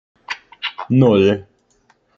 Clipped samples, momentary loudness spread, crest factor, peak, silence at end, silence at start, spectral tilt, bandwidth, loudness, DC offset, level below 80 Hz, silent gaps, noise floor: under 0.1%; 17 LU; 18 dB; 0 dBFS; 0.75 s; 0.3 s; -8 dB/octave; 7.2 kHz; -16 LUFS; under 0.1%; -58 dBFS; none; -59 dBFS